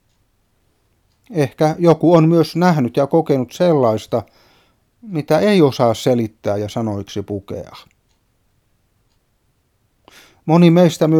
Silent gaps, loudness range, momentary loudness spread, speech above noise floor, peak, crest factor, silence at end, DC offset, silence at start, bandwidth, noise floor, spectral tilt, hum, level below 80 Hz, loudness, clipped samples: none; 14 LU; 15 LU; 48 dB; 0 dBFS; 18 dB; 0 s; under 0.1%; 1.3 s; 15.5 kHz; -63 dBFS; -7.5 dB/octave; none; -58 dBFS; -16 LUFS; under 0.1%